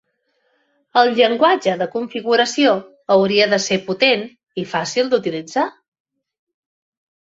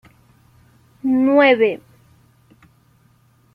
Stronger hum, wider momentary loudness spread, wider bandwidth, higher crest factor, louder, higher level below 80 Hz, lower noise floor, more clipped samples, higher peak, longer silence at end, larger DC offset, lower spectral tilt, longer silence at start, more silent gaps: neither; second, 9 LU vs 14 LU; first, 8 kHz vs 5.4 kHz; about the same, 18 dB vs 20 dB; about the same, -17 LUFS vs -16 LUFS; about the same, -64 dBFS vs -64 dBFS; first, -67 dBFS vs -56 dBFS; neither; about the same, -2 dBFS vs -2 dBFS; second, 1.5 s vs 1.8 s; neither; second, -3.5 dB/octave vs -6.5 dB/octave; about the same, 0.95 s vs 1.05 s; neither